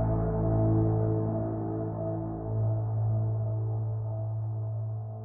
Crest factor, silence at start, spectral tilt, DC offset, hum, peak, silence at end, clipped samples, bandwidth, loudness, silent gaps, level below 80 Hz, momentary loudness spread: 14 dB; 0 s; -15.5 dB/octave; under 0.1%; none; -16 dBFS; 0 s; under 0.1%; 1.9 kHz; -30 LUFS; none; -44 dBFS; 7 LU